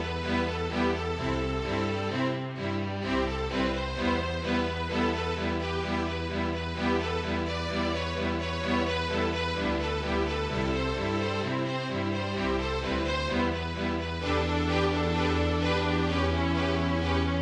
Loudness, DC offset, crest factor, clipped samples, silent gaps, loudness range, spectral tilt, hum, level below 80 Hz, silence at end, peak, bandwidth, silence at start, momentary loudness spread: -29 LUFS; under 0.1%; 14 dB; under 0.1%; none; 2 LU; -6 dB/octave; none; -40 dBFS; 0 s; -14 dBFS; 10 kHz; 0 s; 4 LU